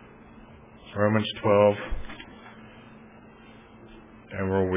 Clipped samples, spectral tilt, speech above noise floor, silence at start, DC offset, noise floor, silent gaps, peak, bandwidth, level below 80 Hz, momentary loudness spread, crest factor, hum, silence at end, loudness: under 0.1%; -10.5 dB/octave; 26 dB; 0.5 s; under 0.1%; -50 dBFS; none; -6 dBFS; 3.8 kHz; -46 dBFS; 28 LU; 22 dB; none; 0 s; -25 LUFS